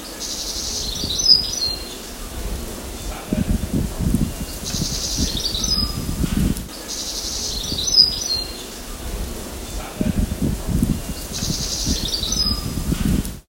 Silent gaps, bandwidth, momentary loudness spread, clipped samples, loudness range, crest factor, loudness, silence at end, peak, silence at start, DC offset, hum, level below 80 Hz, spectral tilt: none; 17 kHz; 16 LU; under 0.1%; 5 LU; 22 dB; -21 LUFS; 0.05 s; 0 dBFS; 0 s; under 0.1%; none; -30 dBFS; -3 dB/octave